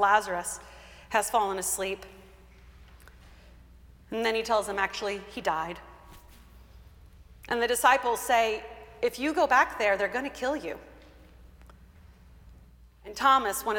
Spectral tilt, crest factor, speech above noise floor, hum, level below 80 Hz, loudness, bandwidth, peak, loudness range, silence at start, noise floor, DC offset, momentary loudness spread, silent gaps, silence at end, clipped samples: -2 dB/octave; 22 dB; 27 dB; none; -54 dBFS; -27 LUFS; 18 kHz; -8 dBFS; 7 LU; 0 s; -54 dBFS; under 0.1%; 17 LU; none; 0 s; under 0.1%